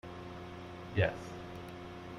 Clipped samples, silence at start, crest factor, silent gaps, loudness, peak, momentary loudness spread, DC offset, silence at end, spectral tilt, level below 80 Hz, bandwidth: under 0.1%; 0.05 s; 22 dB; none; -40 LUFS; -16 dBFS; 13 LU; under 0.1%; 0 s; -6.5 dB/octave; -60 dBFS; 12 kHz